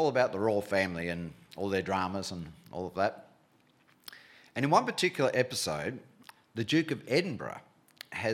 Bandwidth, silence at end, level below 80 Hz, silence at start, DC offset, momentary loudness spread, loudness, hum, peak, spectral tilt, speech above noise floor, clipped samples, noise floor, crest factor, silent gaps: 17 kHz; 0 s; -66 dBFS; 0 s; under 0.1%; 20 LU; -31 LUFS; none; -10 dBFS; -4.5 dB/octave; 35 dB; under 0.1%; -66 dBFS; 22 dB; none